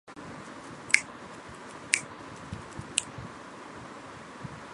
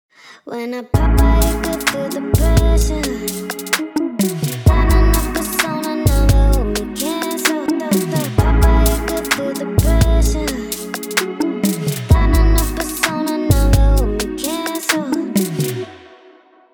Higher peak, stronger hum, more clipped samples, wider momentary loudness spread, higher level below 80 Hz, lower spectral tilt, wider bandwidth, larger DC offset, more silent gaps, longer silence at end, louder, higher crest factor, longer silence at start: about the same, 0 dBFS vs 0 dBFS; neither; neither; first, 19 LU vs 8 LU; second, -60 dBFS vs -18 dBFS; second, -1.5 dB/octave vs -5 dB/octave; second, 11.5 kHz vs over 20 kHz; neither; neither; second, 0 s vs 0.75 s; second, -31 LUFS vs -17 LUFS; first, 36 dB vs 16 dB; second, 0.05 s vs 0.25 s